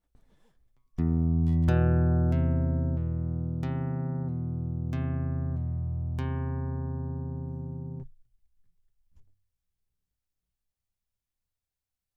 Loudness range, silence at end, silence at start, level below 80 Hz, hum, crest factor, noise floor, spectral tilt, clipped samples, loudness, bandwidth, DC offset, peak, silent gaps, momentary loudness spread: 14 LU; 2.95 s; 1 s; -38 dBFS; none; 18 dB; -89 dBFS; -10.5 dB/octave; under 0.1%; -29 LUFS; 3.9 kHz; under 0.1%; -12 dBFS; none; 12 LU